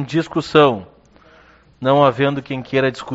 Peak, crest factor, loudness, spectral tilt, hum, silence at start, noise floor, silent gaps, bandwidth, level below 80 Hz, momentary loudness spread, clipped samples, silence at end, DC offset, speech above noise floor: 0 dBFS; 18 dB; -17 LUFS; -4.5 dB/octave; none; 0 s; -49 dBFS; none; 8 kHz; -54 dBFS; 10 LU; under 0.1%; 0 s; under 0.1%; 33 dB